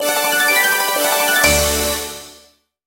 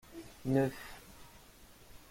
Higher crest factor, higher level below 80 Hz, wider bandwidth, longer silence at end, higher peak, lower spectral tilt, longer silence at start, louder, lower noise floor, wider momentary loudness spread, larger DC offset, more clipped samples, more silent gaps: about the same, 18 dB vs 20 dB; first, -34 dBFS vs -60 dBFS; about the same, 17 kHz vs 16.5 kHz; first, 0.55 s vs 0.15 s; first, 0 dBFS vs -18 dBFS; second, -1.5 dB/octave vs -7 dB/octave; about the same, 0 s vs 0.1 s; first, -14 LUFS vs -34 LUFS; second, -51 dBFS vs -58 dBFS; second, 11 LU vs 25 LU; neither; neither; neither